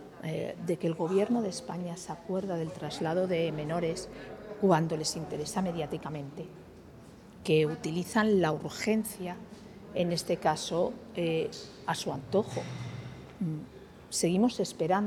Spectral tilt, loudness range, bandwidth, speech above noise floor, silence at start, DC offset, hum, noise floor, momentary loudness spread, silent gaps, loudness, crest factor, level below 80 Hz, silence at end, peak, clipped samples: -5.5 dB/octave; 3 LU; 18 kHz; 20 dB; 0 s; under 0.1%; none; -51 dBFS; 17 LU; none; -32 LUFS; 20 dB; -62 dBFS; 0 s; -10 dBFS; under 0.1%